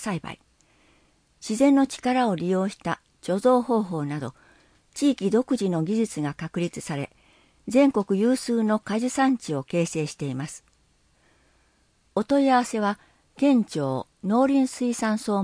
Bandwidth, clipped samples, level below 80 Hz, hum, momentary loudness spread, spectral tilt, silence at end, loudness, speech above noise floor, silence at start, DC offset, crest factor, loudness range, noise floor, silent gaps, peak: 10.5 kHz; under 0.1%; -62 dBFS; none; 13 LU; -6 dB/octave; 0 s; -24 LUFS; 41 dB; 0 s; under 0.1%; 18 dB; 4 LU; -64 dBFS; none; -8 dBFS